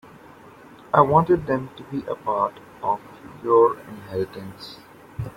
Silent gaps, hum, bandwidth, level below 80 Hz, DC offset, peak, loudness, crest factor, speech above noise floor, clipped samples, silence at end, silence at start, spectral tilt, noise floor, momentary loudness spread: none; none; 16 kHz; -54 dBFS; under 0.1%; -2 dBFS; -22 LUFS; 22 dB; 24 dB; under 0.1%; 0.05 s; 0.95 s; -8.5 dB/octave; -46 dBFS; 20 LU